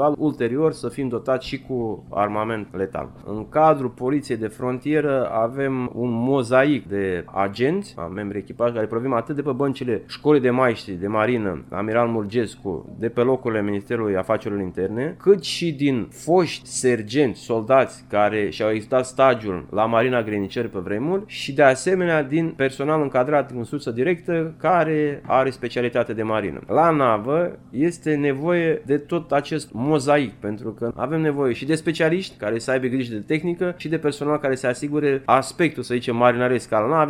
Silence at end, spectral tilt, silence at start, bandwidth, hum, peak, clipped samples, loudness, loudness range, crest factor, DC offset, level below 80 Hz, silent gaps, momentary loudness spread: 0 s; -6 dB/octave; 0 s; 13.5 kHz; none; -2 dBFS; under 0.1%; -22 LUFS; 3 LU; 20 dB; under 0.1%; -54 dBFS; none; 9 LU